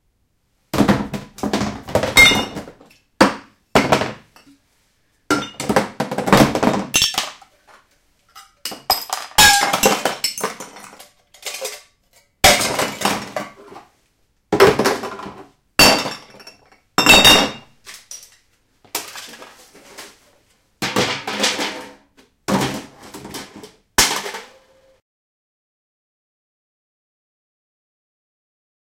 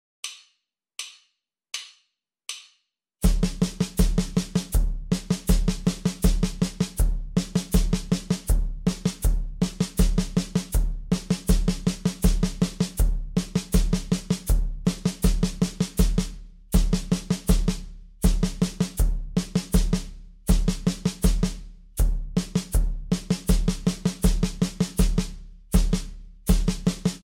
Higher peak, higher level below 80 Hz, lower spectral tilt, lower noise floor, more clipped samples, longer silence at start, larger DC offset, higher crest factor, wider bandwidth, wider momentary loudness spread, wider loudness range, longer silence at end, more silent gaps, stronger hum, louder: first, 0 dBFS vs -6 dBFS; second, -42 dBFS vs -26 dBFS; second, -2.5 dB/octave vs -5.5 dB/octave; second, -65 dBFS vs -74 dBFS; neither; first, 0.75 s vs 0.25 s; neither; about the same, 20 dB vs 18 dB; about the same, 17 kHz vs 17 kHz; first, 24 LU vs 11 LU; first, 10 LU vs 2 LU; first, 4.55 s vs 0.05 s; neither; neither; first, -16 LUFS vs -26 LUFS